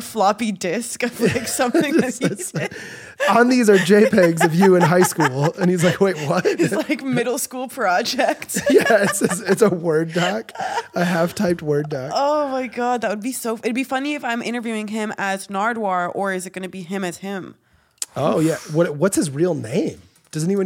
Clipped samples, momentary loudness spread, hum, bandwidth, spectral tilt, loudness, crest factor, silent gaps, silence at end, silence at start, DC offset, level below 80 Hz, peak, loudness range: under 0.1%; 12 LU; none; 17 kHz; -5 dB/octave; -19 LUFS; 18 dB; none; 0 s; 0 s; under 0.1%; -60 dBFS; -2 dBFS; 8 LU